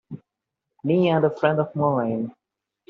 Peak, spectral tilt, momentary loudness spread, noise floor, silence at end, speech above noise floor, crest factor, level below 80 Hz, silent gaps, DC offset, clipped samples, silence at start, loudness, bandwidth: -4 dBFS; -6.5 dB/octave; 15 LU; -84 dBFS; 0.6 s; 63 dB; 20 dB; -66 dBFS; none; under 0.1%; under 0.1%; 0.1 s; -22 LUFS; 6.6 kHz